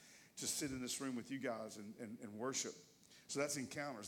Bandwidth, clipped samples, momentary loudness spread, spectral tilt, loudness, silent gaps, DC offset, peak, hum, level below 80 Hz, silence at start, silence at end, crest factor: 17.5 kHz; under 0.1%; 12 LU; -3 dB/octave; -44 LUFS; none; under 0.1%; -26 dBFS; none; -78 dBFS; 0 s; 0 s; 20 dB